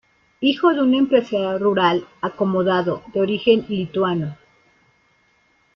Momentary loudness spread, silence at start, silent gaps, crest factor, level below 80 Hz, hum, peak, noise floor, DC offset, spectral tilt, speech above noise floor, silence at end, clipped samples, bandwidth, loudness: 7 LU; 0.4 s; none; 16 dB; -60 dBFS; none; -4 dBFS; -61 dBFS; under 0.1%; -7.5 dB/octave; 42 dB; 1.4 s; under 0.1%; 6.4 kHz; -19 LUFS